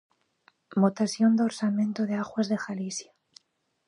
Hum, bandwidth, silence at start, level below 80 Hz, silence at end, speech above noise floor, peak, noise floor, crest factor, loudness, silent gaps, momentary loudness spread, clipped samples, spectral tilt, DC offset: none; 11 kHz; 0.7 s; -76 dBFS; 0.85 s; 49 dB; -10 dBFS; -75 dBFS; 18 dB; -27 LUFS; none; 10 LU; under 0.1%; -5.5 dB/octave; under 0.1%